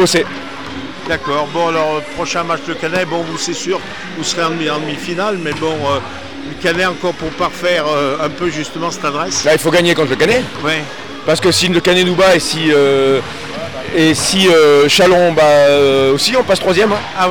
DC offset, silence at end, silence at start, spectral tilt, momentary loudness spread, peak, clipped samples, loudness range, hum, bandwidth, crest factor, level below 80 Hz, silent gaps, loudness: 2%; 0 s; 0 s; -3.5 dB/octave; 12 LU; -2 dBFS; under 0.1%; 8 LU; none; 20 kHz; 12 dB; -44 dBFS; none; -13 LUFS